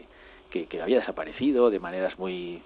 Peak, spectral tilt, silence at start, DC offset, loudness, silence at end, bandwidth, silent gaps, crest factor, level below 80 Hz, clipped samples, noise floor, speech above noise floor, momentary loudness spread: -8 dBFS; -8.5 dB/octave; 0.25 s; under 0.1%; -27 LUFS; 0.05 s; 4.7 kHz; none; 20 dB; -58 dBFS; under 0.1%; -51 dBFS; 25 dB; 11 LU